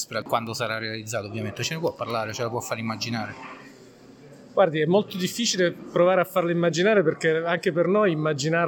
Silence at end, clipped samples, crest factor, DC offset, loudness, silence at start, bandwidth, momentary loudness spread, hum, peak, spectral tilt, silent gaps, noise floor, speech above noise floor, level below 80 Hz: 0 s; under 0.1%; 16 dB; under 0.1%; -24 LUFS; 0 s; 17.5 kHz; 10 LU; none; -8 dBFS; -4.5 dB/octave; none; -49 dBFS; 25 dB; -70 dBFS